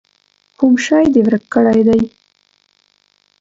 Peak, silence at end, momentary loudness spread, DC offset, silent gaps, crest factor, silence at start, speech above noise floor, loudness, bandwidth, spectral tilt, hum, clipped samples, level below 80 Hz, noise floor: 0 dBFS; 1.3 s; 5 LU; under 0.1%; none; 14 dB; 0.6 s; 47 dB; -13 LUFS; 7.8 kHz; -6 dB/octave; none; under 0.1%; -48 dBFS; -59 dBFS